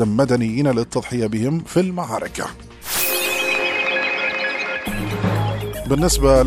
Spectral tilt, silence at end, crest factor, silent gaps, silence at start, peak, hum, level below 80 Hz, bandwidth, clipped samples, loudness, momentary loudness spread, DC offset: -4.5 dB/octave; 0 s; 18 dB; none; 0 s; -2 dBFS; none; -32 dBFS; 15.5 kHz; under 0.1%; -20 LUFS; 7 LU; under 0.1%